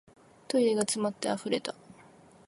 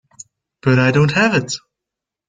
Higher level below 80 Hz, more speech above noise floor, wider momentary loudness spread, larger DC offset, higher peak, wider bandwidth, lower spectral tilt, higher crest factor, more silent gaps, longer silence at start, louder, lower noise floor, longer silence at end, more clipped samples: second, -74 dBFS vs -52 dBFS; second, 27 dB vs 70 dB; about the same, 10 LU vs 12 LU; neither; second, -10 dBFS vs -2 dBFS; first, 11.5 kHz vs 9.4 kHz; second, -3.5 dB/octave vs -5.5 dB/octave; first, 22 dB vs 16 dB; neither; first, 0.5 s vs 0.2 s; second, -30 LUFS vs -15 LUFS; second, -56 dBFS vs -84 dBFS; second, 0.55 s vs 0.7 s; neither